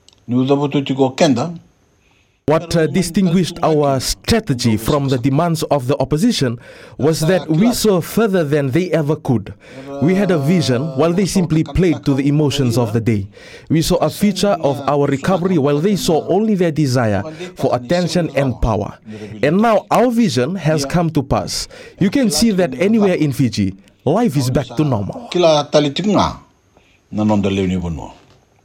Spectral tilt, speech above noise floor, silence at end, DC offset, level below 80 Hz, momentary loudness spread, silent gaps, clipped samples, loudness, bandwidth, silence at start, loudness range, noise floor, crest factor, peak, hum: -6 dB/octave; 41 dB; 0.5 s; under 0.1%; -38 dBFS; 8 LU; none; under 0.1%; -16 LUFS; 17 kHz; 0.3 s; 1 LU; -56 dBFS; 16 dB; 0 dBFS; none